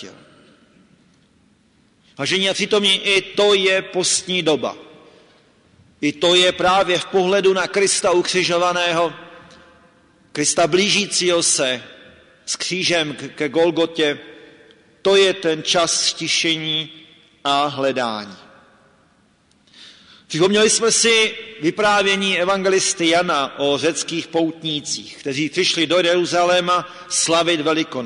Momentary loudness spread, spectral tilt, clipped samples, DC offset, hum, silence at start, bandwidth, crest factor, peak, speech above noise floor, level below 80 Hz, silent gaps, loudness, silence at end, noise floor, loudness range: 10 LU; -2.5 dB/octave; under 0.1%; under 0.1%; none; 0 s; 11 kHz; 14 dB; -6 dBFS; 39 dB; -60 dBFS; none; -17 LUFS; 0 s; -57 dBFS; 5 LU